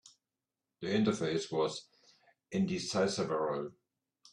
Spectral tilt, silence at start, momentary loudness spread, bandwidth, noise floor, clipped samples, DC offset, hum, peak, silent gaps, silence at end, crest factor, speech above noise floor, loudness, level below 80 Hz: -5 dB/octave; 0.05 s; 10 LU; 11 kHz; under -90 dBFS; under 0.1%; under 0.1%; none; -16 dBFS; none; 0.6 s; 18 dB; over 57 dB; -34 LUFS; -72 dBFS